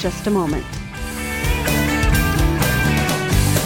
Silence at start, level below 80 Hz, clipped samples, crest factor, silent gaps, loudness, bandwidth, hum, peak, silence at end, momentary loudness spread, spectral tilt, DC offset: 0 s; -24 dBFS; under 0.1%; 14 dB; none; -19 LUFS; 17.5 kHz; none; -4 dBFS; 0 s; 9 LU; -4.5 dB/octave; under 0.1%